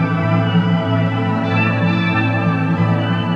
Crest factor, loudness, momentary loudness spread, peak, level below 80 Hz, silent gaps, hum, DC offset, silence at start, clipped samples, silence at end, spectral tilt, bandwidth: 12 dB; -16 LUFS; 2 LU; -4 dBFS; -52 dBFS; none; none; under 0.1%; 0 s; under 0.1%; 0 s; -8.5 dB/octave; 6.2 kHz